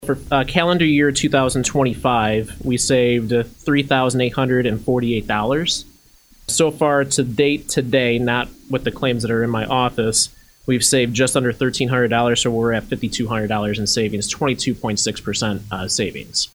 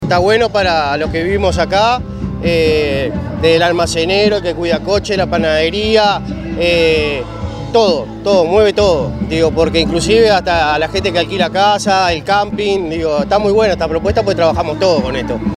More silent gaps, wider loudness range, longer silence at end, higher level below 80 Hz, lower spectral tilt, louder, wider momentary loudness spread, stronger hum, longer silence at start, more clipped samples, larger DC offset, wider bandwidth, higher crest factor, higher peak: neither; about the same, 2 LU vs 2 LU; about the same, 0.1 s vs 0 s; second, -42 dBFS vs -32 dBFS; about the same, -4 dB/octave vs -5 dB/octave; second, -18 LUFS vs -13 LUFS; about the same, 6 LU vs 6 LU; neither; about the same, 0 s vs 0 s; neither; neither; first, over 20 kHz vs 13 kHz; about the same, 18 dB vs 14 dB; about the same, 0 dBFS vs 0 dBFS